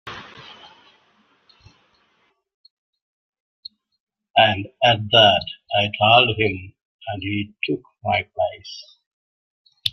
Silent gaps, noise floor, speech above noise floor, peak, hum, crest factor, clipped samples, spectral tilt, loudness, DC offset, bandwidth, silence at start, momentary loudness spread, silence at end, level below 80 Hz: 2.54-2.64 s, 2.70-2.93 s, 3.02-3.33 s, 3.40-3.63 s, 4.00-4.07 s, 6.82-6.99 s, 9.06-9.65 s; -66 dBFS; 46 dB; -2 dBFS; none; 22 dB; under 0.1%; -5 dB/octave; -18 LUFS; under 0.1%; 13 kHz; 0.05 s; 26 LU; 0 s; -58 dBFS